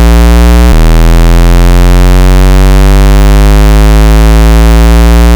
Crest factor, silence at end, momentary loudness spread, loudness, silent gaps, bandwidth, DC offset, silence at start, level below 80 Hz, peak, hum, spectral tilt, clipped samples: 2 dB; 0 s; 1 LU; -5 LUFS; none; over 20 kHz; under 0.1%; 0 s; -2 dBFS; 0 dBFS; none; -6 dB/octave; under 0.1%